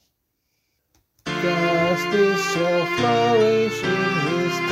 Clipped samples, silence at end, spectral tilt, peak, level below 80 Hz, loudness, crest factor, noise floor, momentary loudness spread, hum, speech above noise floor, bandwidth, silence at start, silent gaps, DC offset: under 0.1%; 0 s; -5 dB/octave; -8 dBFS; -58 dBFS; -20 LUFS; 14 dB; -73 dBFS; 5 LU; none; 54 dB; 16 kHz; 1.25 s; none; under 0.1%